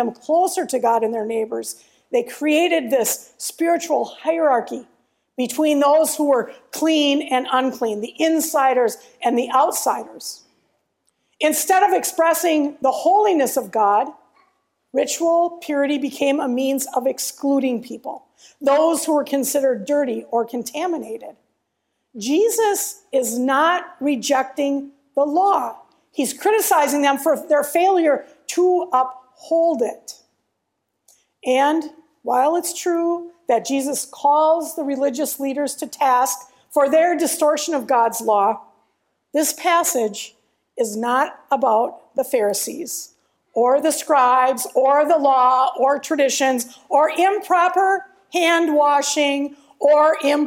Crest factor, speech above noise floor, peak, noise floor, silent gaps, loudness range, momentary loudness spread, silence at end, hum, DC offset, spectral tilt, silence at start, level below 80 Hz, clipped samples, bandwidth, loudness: 16 dB; 56 dB; -4 dBFS; -75 dBFS; none; 5 LU; 10 LU; 0 s; none; under 0.1%; -2 dB/octave; 0 s; -74 dBFS; under 0.1%; 16.5 kHz; -19 LUFS